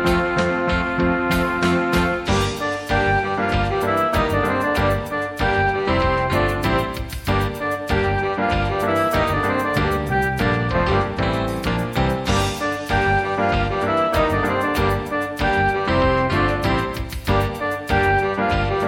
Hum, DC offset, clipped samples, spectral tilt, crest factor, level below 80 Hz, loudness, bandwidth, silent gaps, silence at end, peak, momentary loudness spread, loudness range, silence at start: none; under 0.1%; under 0.1%; -6 dB/octave; 16 dB; -32 dBFS; -20 LUFS; 17 kHz; none; 0 s; -4 dBFS; 4 LU; 1 LU; 0 s